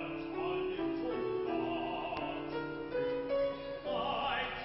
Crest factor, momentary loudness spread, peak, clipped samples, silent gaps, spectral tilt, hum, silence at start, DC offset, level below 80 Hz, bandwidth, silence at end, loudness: 16 dB; 5 LU; -20 dBFS; under 0.1%; none; -3 dB/octave; none; 0 s; under 0.1%; -60 dBFS; 5.8 kHz; 0 s; -37 LUFS